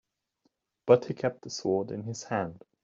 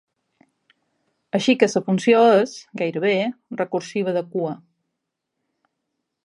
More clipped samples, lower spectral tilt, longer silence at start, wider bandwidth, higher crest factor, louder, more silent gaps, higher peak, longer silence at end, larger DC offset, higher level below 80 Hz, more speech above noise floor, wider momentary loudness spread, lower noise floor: neither; about the same, -5.5 dB/octave vs -5.5 dB/octave; second, 0.85 s vs 1.35 s; second, 7.8 kHz vs 11 kHz; about the same, 24 dB vs 22 dB; second, -29 LUFS vs -20 LUFS; neither; second, -8 dBFS vs 0 dBFS; second, 0.25 s vs 1.7 s; neither; about the same, -70 dBFS vs -74 dBFS; second, 47 dB vs 60 dB; about the same, 13 LU vs 12 LU; second, -75 dBFS vs -80 dBFS